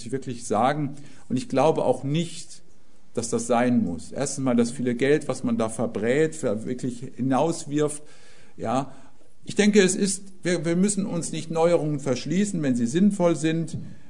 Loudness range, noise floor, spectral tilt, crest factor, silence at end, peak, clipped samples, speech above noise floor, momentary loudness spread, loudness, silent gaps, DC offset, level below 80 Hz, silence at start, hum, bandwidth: 3 LU; -58 dBFS; -5.5 dB/octave; 20 dB; 0.15 s; -6 dBFS; under 0.1%; 34 dB; 11 LU; -24 LUFS; none; 1%; -60 dBFS; 0 s; none; 11 kHz